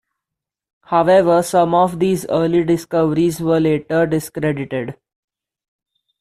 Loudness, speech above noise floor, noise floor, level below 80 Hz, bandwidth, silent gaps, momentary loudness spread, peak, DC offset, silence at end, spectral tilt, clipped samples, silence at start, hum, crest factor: -17 LUFS; 68 dB; -84 dBFS; -52 dBFS; 14.5 kHz; none; 9 LU; -2 dBFS; under 0.1%; 1.3 s; -6.5 dB/octave; under 0.1%; 0.9 s; none; 14 dB